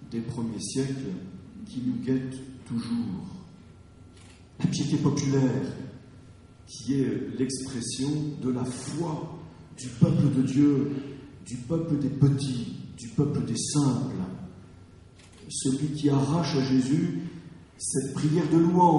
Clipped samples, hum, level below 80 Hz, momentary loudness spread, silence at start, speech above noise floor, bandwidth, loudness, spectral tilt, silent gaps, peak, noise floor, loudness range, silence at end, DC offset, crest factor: under 0.1%; none; -56 dBFS; 17 LU; 0 s; 25 dB; 11.5 kHz; -27 LUFS; -6.5 dB/octave; none; -6 dBFS; -51 dBFS; 6 LU; 0 s; under 0.1%; 20 dB